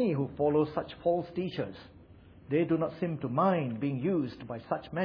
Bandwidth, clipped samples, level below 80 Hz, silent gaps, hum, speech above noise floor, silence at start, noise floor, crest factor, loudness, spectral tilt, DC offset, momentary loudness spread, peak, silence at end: 5.4 kHz; under 0.1%; -62 dBFS; none; none; 24 dB; 0 s; -54 dBFS; 16 dB; -31 LUFS; -10 dB/octave; under 0.1%; 10 LU; -14 dBFS; 0 s